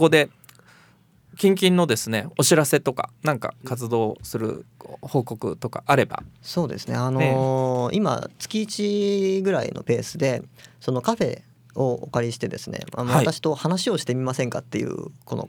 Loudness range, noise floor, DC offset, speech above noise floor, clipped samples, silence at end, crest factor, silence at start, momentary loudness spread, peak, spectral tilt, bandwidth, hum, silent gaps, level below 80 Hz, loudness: 4 LU; -56 dBFS; under 0.1%; 33 dB; under 0.1%; 0 s; 20 dB; 0 s; 12 LU; -4 dBFS; -5 dB/octave; over 20 kHz; none; none; -60 dBFS; -23 LUFS